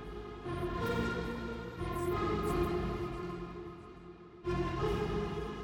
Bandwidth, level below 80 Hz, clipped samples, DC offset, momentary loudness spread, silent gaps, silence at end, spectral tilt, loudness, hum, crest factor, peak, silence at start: 19 kHz; -46 dBFS; under 0.1%; under 0.1%; 13 LU; none; 0 s; -7 dB/octave; -37 LUFS; none; 16 dB; -20 dBFS; 0 s